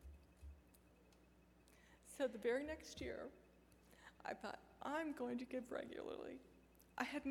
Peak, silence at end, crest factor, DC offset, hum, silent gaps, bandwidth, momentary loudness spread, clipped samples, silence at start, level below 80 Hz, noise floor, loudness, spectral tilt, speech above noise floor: -24 dBFS; 0 s; 26 dB; under 0.1%; none; none; 18 kHz; 24 LU; under 0.1%; 0 s; -68 dBFS; -70 dBFS; -48 LUFS; -4.5 dB/octave; 24 dB